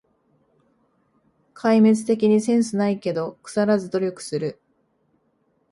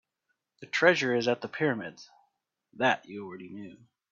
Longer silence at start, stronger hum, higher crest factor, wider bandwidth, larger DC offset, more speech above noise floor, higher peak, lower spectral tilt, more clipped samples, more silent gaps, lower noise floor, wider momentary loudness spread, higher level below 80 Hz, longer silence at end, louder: first, 1.65 s vs 0.6 s; neither; second, 16 dB vs 24 dB; first, 11.5 kHz vs 7.6 kHz; neither; second, 47 dB vs 52 dB; about the same, -8 dBFS vs -8 dBFS; first, -6.5 dB/octave vs -4.5 dB/octave; neither; neither; second, -67 dBFS vs -81 dBFS; second, 11 LU vs 20 LU; first, -68 dBFS vs -76 dBFS; first, 1.2 s vs 0.35 s; first, -21 LUFS vs -27 LUFS